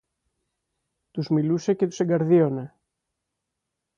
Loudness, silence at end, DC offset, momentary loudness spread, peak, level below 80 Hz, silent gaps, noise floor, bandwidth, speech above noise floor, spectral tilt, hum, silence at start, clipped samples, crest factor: -23 LUFS; 1.3 s; under 0.1%; 15 LU; -8 dBFS; -68 dBFS; none; -82 dBFS; 7.4 kHz; 60 dB; -8 dB/octave; none; 1.15 s; under 0.1%; 18 dB